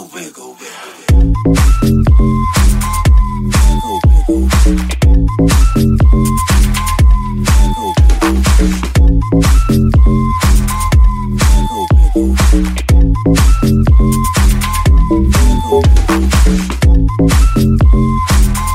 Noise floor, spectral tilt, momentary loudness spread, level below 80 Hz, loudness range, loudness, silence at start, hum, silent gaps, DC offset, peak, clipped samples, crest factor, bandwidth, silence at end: -31 dBFS; -6 dB/octave; 3 LU; -10 dBFS; 1 LU; -11 LUFS; 0 s; none; none; under 0.1%; 0 dBFS; under 0.1%; 8 dB; 16 kHz; 0 s